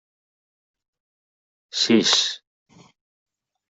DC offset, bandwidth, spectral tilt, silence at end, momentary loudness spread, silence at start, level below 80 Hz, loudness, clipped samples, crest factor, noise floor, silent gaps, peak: under 0.1%; 8.2 kHz; -2.5 dB/octave; 1.3 s; 15 LU; 1.75 s; -72 dBFS; -19 LUFS; under 0.1%; 24 dB; under -90 dBFS; none; -4 dBFS